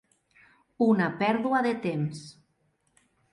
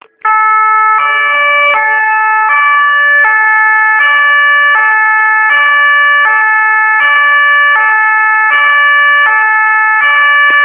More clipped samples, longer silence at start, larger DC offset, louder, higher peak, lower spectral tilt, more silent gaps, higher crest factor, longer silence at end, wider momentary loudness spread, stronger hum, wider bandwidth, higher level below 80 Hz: neither; first, 0.8 s vs 0.25 s; neither; second, -27 LUFS vs -6 LUFS; second, -12 dBFS vs 0 dBFS; first, -7 dB/octave vs -1.5 dB/octave; neither; first, 18 dB vs 8 dB; first, 1 s vs 0 s; first, 13 LU vs 2 LU; neither; first, 11 kHz vs 3.7 kHz; about the same, -72 dBFS vs -68 dBFS